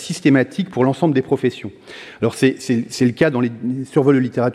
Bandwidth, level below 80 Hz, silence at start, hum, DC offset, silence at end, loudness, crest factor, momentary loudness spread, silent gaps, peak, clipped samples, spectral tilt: 13 kHz; -58 dBFS; 0 s; none; under 0.1%; 0 s; -18 LUFS; 16 dB; 9 LU; none; -2 dBFS; under 0.1%; -6.5 dB/octave